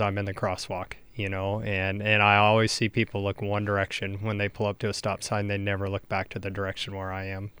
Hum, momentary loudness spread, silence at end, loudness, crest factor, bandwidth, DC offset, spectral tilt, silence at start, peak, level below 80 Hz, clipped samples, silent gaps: none; 13 LU; 0 s; -27 LUFS; 22 dB; over 20 kHz; under 0.1%; -5 dB/octave; 0 s; -6 dBFS; -56 dBFS; under 0.1%; none